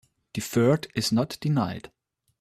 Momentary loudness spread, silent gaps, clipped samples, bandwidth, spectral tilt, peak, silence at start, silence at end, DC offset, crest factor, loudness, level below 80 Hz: 13 LU; none; under 0.1%; 16 kHz; -5.5 dB/octave; -10 dBFS; 0.35 s; 0.55 s; under 0.1%; 18 dB; -26 LUFS; -60 dBFS